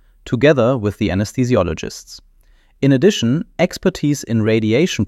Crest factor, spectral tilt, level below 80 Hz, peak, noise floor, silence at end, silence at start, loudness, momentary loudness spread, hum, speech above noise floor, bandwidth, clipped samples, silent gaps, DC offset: 16 dB; -6 dB/octave; -42 dBFS; -2 dBFS; -51 dBFS; 0 s; 0.25 s; -17 LUFS; 8 LU; none; 35 dB; 15 kHz; under 0.1%; none; under 0.1%